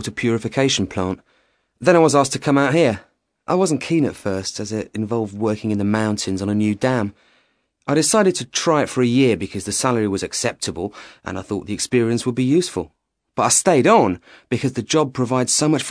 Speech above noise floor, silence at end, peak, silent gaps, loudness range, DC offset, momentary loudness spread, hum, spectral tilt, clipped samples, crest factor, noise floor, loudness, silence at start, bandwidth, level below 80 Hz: 45 dB; 0 s; 0 dBFS; none; 4 LU; under 0.1%; 12 LU; none; -4.5 dB/octave; under 0.1%; 18 dB; -64 dBFS; -19 LUFS; 0 s; 11 kHz; -54 dBFS